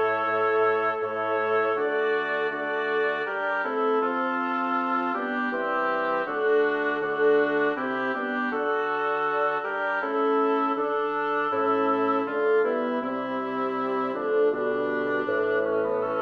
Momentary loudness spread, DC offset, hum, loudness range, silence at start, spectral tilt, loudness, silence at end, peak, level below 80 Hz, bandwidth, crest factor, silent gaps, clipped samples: 4 LU; under 0.1%; none; 1 LU; 0 s; -6.5 dB/octave; -25 LUFS; 0 s; -12 dBFS; -72 dBFS; 5.6 kHz; 14 dB; none; under 0.1%